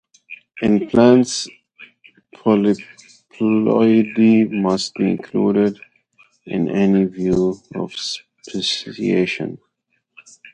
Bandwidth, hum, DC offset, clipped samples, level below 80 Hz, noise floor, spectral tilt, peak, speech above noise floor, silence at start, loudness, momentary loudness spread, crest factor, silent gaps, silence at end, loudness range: 9.6 kHz; none; under 0.1%; under 0.1%; -52 dBFS; -70 dBFS; -6 dB/octave; 0 dBFS; 54 dB; 0.3 s; -18 LUFS; 14 LU; 18 dB; none; 0.05 s; 4 LU